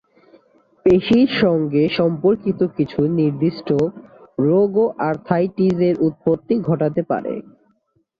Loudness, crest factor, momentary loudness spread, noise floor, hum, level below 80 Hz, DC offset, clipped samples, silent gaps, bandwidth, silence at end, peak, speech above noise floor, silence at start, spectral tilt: -18 LUFS; 14 dB; 7 LU; -64 dBFS; none; -52 dBFS; under 0.1%; under 0.1%; none; 6.8 kHz; 0.8 s; -4 dBFS; 46 dB; 0.85 s; -9 dB/octave